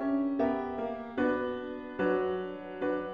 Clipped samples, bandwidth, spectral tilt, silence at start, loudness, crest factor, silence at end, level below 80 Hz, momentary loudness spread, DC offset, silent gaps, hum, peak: under 0.1%; 5 kHz; -8.5 dB/octave; 0 s; -32 LUFS; 14 dB; 0 s; -64 dBFS; 8 LU; under 0.1%; none; none; -18 dBFS